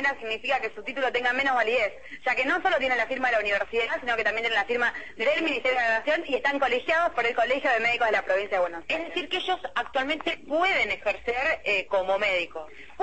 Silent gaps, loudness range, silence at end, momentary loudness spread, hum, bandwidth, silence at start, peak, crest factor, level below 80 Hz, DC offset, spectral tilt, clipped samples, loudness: none; 2 LU; 0 s; 6 LU; none; 8.6 kHz; 0 s; -12 dBFS; 14 dB; -58 dBFS; 0.5%; -3 dB/octave; under 0.1%; -25 LUFS